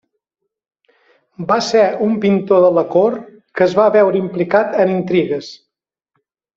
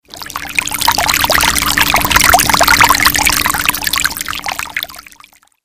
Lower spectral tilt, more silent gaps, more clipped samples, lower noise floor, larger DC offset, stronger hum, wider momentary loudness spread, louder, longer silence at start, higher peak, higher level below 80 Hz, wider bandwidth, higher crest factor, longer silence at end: first, -6.5 dB/octave vs -1 dB/octave; neither; second, under 0.1% vs 0.6%; first, -81 dBFS vs -45 dBFS; second, under 0.1% vs 1%; neither; about the same, 12 LU vs 12 LU; second, -14 LUFS vs -10 LUFS; first, 1.4 s vs 0.1 s; about the same, -2 dBFS vs 0 dBFS; second, -60 dBFS vs -32 dBFS; second, 7.8 kHz vs over 20 kHz; about the same, 14 dB vs 14 dB; first, 1 s vs 0.65 s